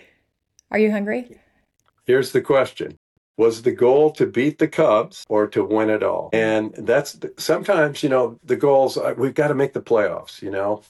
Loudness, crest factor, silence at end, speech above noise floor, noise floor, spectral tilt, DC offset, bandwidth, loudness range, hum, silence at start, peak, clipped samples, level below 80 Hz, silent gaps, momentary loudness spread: -20 LUFS; 14 dB; 0.1 s; 47 dB; -66 dBFS; -6 dB/octave; under 0.1%; 12.5 kHz; 3 LU; none; 0.7 s; -6 dBFS; under 0.1%; -66 dBFS; 2.97-3.35 s; 9 LU